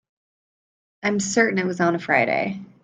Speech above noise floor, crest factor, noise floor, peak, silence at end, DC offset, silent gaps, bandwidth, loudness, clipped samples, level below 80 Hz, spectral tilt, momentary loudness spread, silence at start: over 68 dB; 20 dB; under -90 dBFS; -4 dBFS; 0.2 s; under 0.1%; none; 9.6 kHz; -21 LUFS; under 0.1%; -66 dBFS; -4.5 dB/octave; 6 LU; 1.05 s